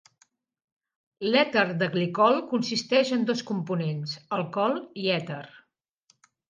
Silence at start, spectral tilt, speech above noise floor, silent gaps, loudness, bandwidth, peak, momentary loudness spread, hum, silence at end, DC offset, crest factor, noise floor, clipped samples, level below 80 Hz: 1.2 s; -5.5 dB/octave; 45 dB; none; -26 LUFS; 9.6 kHz; -6 dBFS; 9 LU; none; 0.9 s; under 0.1%; 20 dB; -70 dBFS; under 0.1%; -76 dBFS